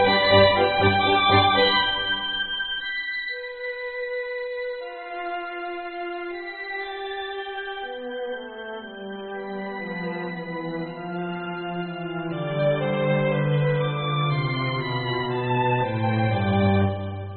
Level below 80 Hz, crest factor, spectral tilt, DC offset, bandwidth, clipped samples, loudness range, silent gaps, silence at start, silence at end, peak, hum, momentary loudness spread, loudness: -54 dBFS; 20 dB; -3.5 dB/octave; under 0.1%; 4.6 kHz; under 0.1%; 11 LU; none; 0 s; 0 s; -4 dBFS; none; 14 LU; -24 LUFS